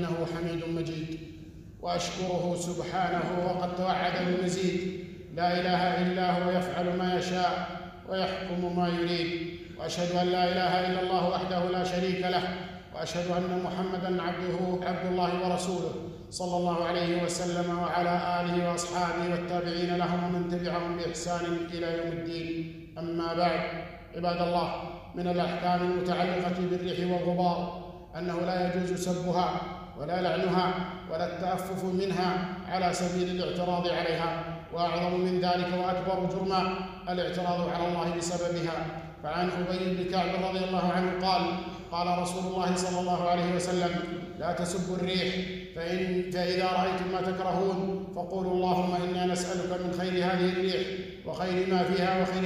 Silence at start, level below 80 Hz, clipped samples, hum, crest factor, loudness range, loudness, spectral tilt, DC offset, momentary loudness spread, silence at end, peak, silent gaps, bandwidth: 0 s; -54 dBFS; under 0.1%; none; 16 dB; 2 LU; -30 LUFS; -5.5 dB/octave; under 0.1%; 8 LU; 0 s; -14 dBFS; none; 14.5 kHz